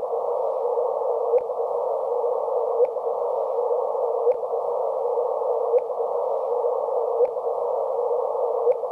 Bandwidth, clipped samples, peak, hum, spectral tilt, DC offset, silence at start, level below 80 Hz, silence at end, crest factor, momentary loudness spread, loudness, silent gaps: 2.7 kHz; under 0.1%; -10 dBFS; none; -5.5 dB/octave; under 0.1%; 0 s; -80 dBFS; 0 s; 14 dB; 3 LU; -24 LUFS; none